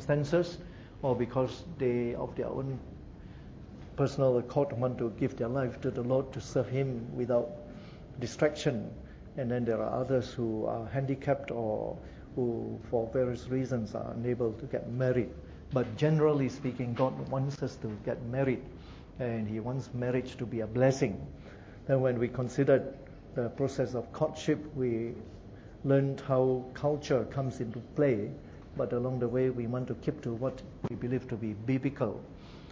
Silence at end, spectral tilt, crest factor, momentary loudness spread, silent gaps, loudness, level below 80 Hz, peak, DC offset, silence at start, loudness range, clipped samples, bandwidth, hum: 0 s; -7.5 dB/octave; 20 dB; 16 LU; none; -32 LUFS; -54 dBFS; -12 dBFS; under 0.1%; 0 s; 3 LU; under 0.1%; 7.8 kHz; none